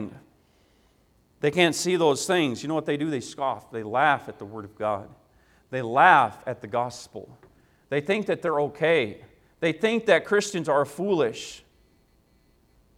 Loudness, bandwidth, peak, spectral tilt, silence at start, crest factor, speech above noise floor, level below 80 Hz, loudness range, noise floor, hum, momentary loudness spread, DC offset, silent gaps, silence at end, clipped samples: -24 LUFS; 16 kHz; -2 dBFS; -4.5 dB/octave; 0 s; 24 dB; 39 dB; -66 dBFS; 4 LU; -63 dBFS; none; 15 LU; under 0.1%; none; 1.4 s; under 0.1%